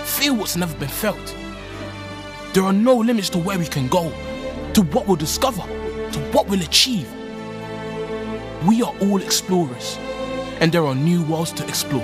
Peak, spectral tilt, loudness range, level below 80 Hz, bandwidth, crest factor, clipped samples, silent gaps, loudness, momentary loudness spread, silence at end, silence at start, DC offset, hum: 0 dBFS; -4.5 dB/octave; 2 LU; -42 dBFS; 15.5 kHz; 20 dB; under 0.1%; none; -20 LUFS; 15 LU; 0 s; 0 s; under 0.1%; none